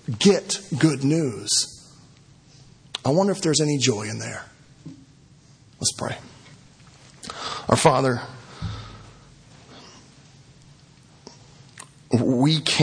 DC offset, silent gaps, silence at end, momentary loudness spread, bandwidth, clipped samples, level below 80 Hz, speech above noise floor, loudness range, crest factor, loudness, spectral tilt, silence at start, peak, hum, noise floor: under 0.1%; none; 0 s; 25 LU; 10.5 kHz; under 0.1%; -54 dBFS; 31 dB; 9 LU; 24 dB; -22 LUFS; -4.5 dB/octave; 0.1 s; 0 dBFS; none; -52 dBFS